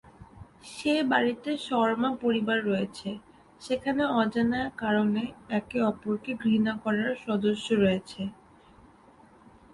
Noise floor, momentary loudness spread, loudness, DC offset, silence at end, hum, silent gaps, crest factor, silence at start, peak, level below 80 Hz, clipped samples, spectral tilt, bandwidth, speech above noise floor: -56 dBFS; 12 LU; -28 LUFS; under 0.1%; 1.4 s; none; none; 18 dB; 0.2 s; -10 dBFS; -60 dBFS; under 0.1%; -6 dB/octave; 11.5 kHz; 29 dB